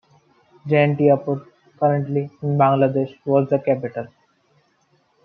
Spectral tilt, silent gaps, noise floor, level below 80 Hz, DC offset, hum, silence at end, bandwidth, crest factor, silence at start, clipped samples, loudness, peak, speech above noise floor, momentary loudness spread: -10.5 dB/octave; none; -63 dBFS; -68 dBFS; under 0.1%; none; 1.2 s; 4.5 kHz; 18 dB; 0.65 s; under 0.1%; -20 LUFS; -2 dBFS; 44 dB; 13 LU